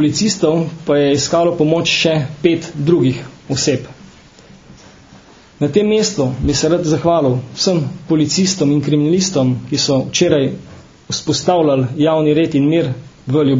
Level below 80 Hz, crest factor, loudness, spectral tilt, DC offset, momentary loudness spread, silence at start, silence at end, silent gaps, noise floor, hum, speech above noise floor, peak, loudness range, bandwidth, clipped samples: -42 dBFS; 16 dB; -15 LUFS; -5 dB/octave; under 0.1%; 6 LU; 0 s; 0 s; none; -42 dBFS; none; 28 dB; 0 dBFS; 4 LU; 7.8 kHz; under 0.1%